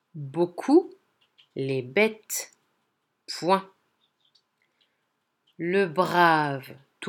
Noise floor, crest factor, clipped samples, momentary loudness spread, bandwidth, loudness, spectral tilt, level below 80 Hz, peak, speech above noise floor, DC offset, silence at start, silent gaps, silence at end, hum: -76 dBFS; 22 dB; under 0.1%; 16 LU; 19.5 kHz; -25 LUFS; -4.5 dB/octave; -82 dBFS; -6 dBFS; 52 dB; under 0.1%; 0.15 s; none; 0 s; none